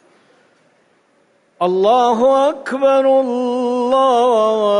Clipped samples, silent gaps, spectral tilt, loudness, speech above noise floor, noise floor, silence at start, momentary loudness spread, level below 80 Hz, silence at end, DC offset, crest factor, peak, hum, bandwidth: under 0.1%; none; -5 dB/octave; -14 LUFS; 43 dB; -57 dBFS; 1.6 s; 6 LU; -64 dBFS; 0 s; under 0.1%; 12 dB; -4 dBFS; none; 10.5 kHz